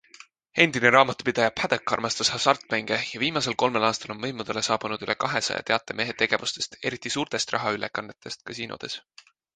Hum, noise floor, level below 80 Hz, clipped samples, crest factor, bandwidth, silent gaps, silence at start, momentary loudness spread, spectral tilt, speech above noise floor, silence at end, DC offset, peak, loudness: none; -52 dBFS; -64 dBFS; under 0.1%; 24 dB; 9.8 kHz; none; 0.55 s; 13 LU; -3 dB/octave; 26 dB; 0.55 s; under 0.1%; -2 dBFS; -25 LUFS